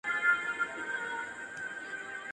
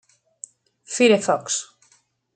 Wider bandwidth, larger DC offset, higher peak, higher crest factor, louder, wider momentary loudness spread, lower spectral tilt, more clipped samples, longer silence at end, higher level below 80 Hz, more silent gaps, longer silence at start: first, 11 kHz vs 9.4 kHz; neither; second, -16 dBFS vs -4 dBFS; about the same, 18 dB vs 20 dB; second, -34 LUFS vs -20 LUFS; second, 12 LU vs 24 LU; about the same, -2 dB/octave vs -3 dB/octave; neither; second, 0 s vs 0.7 s; about the same, -76 dBFS vs -74 dBFS; neither; second, 0.05 s vs 0.9 s